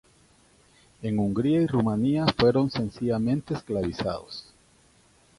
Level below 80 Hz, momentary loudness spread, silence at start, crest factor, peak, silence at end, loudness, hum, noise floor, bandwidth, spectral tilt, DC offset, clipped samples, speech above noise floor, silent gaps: -52 dBFS; 11 LU; 1 s; 22 dB; -6 dBFS; 0.95 s; -26 LUFS; none; -60 dBFS; 11.5 kHz; -7.5 dB/octave; under 0.1%; under 0.1%; 35 dB; none